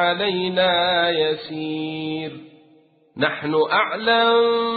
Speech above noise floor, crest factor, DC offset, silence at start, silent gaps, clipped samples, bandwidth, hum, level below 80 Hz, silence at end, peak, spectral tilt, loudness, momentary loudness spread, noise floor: 35 dB; 16 dB; under 0.1%; 0 s; none; under 0.1%; 4.8 kHz; none; -60 dBFS; 0 s; -4 dBFS; -9.5 dB/octave; -20 LUFS; 11 LU; -55 dBFS